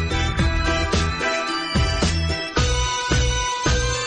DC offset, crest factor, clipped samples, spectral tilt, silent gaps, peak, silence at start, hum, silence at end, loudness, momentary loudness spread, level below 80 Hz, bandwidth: under 0.1%; 10 dB; under 0.1%; -4 dB/octave; none; -10 dBFS; 0 s; none; 0 s; -21 LUFS; 2 LU; -26 dBFS; 10 kHz